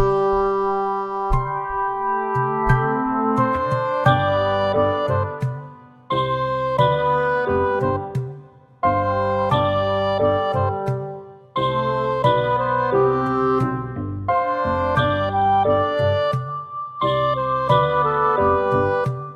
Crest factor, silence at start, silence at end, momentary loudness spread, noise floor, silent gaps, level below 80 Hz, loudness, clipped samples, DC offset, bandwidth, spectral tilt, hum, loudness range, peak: 18 dB; 0 s; 0 s; 8 LU; -43 dBFS; none; -40 dBFS; -20 LUFS; under 0.1%; under 0.1%; 8.2 kHz; -8 dB/octave; none; 2 LU; -2 dBFS